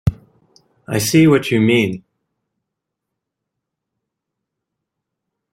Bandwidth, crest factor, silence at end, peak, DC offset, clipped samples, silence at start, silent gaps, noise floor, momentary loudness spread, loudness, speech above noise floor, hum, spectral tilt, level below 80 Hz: 16.5 kHz; 20 dB; 3.55 s; -2 dBFS; under 0.1%; under 0.1%; 0.05 s; none; -80 dBFS; 11 LU; -15 LUFS; 66 dB; none; -5.5 dB/octave; -44 dBFS